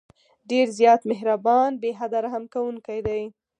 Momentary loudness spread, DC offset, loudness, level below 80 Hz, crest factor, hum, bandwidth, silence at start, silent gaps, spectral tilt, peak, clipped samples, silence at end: 11 LU; under 0.1%; -23 LUFS; -56 dBFS; 18 dB; none; 10.5 kHz; 0.5 s; none; -5 dB/octave; -4 dBFS; under 0.1%; 0.3 s